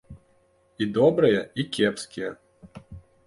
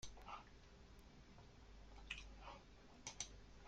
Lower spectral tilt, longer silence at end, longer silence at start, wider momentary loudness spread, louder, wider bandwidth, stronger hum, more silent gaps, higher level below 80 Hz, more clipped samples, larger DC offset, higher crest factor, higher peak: first, -5.5 dB/octave vs -2 dB/octave; first, 0.3 s vs 0 s; about the same, 0.1 s vs 0 s; first, 17 LU vs 13 LU; first, -24 LUFS vs -57 LUFS; second, 11.5 kHz vs 16 kHz; neither; neither; first, -56 dBFS vs -64 dBFS; neither; neither; second, 18 dB vs 28 dB; first, -8 dBFS vs -30 dBFS